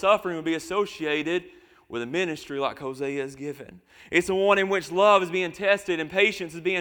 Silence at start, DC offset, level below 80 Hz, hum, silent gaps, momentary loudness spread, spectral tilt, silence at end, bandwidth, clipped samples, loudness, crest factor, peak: 0 s; under 0.1%; -62 dBFS; none; none; 11 LU; -4.5 dB/octave; 0 s; 19 kHz; under 0.1%; -25 LUFS; 20 dB; -4 dBFS